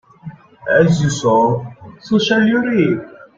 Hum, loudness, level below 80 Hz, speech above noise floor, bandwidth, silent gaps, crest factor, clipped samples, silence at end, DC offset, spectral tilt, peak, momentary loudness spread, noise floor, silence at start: none; -15 LUFS; -50 dBFS; 22 dB; 7.8 kHz; none; 14 dB; under 0.1%; 0.3 s; under 0.1%; -6 dB/octave; -2 dBFS; 10 LU; -36 dBFS; 0.25 s